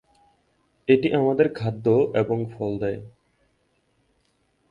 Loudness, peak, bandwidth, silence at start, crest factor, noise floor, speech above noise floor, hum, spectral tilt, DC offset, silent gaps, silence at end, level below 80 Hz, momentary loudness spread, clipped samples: -23 LUFS; -6 dBFS; 7 kHz; 0.9 s; 20 dB; -68 dBFS; 46 dB; none; -9 dB/octave; under 0.1%; none; 1.6 s; -58 dBFS; 10 LU; under 0.1%